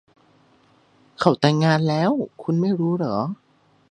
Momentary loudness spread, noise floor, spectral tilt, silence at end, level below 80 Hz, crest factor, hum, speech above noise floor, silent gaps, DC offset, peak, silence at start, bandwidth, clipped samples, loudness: 8 LU; -58 dBFS; -7 dB/octave; 0.6 s; -64 dBFS; 22 dB; none; 38 dB; none; under 0.1%; 0 dBFS; 1.2 s; 9.6 kHz; under 0.1%; -21 LUFS